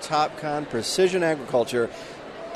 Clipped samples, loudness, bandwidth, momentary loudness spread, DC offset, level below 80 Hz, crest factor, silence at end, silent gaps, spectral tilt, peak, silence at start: under 0.1%; -24 LUFS; 13.5 kHz; 16 LU; under 0.1%; -60 dBFS; 14 dB; 0 s; none; -4 dB/octave; -10 dBFS; 0 s